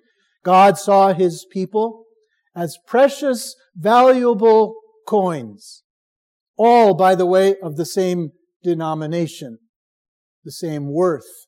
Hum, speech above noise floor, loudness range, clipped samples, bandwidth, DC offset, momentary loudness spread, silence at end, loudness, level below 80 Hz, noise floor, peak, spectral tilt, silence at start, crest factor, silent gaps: none; 45 dB; 8 LU; under 0.1%; 16.5 kHz; under 0.1%; 17 LU; 0.25 s; -17 LUFS; -74 dBFS; -61 dBFS; -2 dBFS; -6 dB/octave; 0.45 s; 16 dB; 5.84-6.54 s, 8.56-8.60 s, 9.69-10.42 s